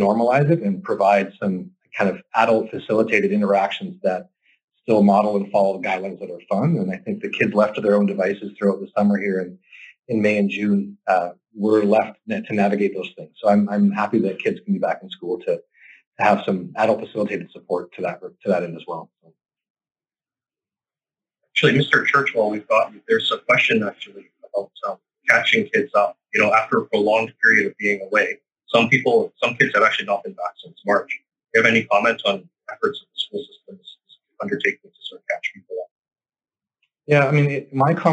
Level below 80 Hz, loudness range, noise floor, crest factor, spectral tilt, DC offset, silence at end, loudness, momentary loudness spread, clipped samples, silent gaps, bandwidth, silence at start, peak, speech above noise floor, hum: -76 dBFS; 9 LU; under -90 dBFS; 20 dB; -6 dB/octave; under 0.1%; 0 s; -20 LUFS; 14 LU; under 0.1%; 4.64-4.68 s, 16.07-16.12 s, 19.70-19.75 s, 35.91-36.03 s; 9 kHz; 0 s; 0 dBFS; over 70 dB; none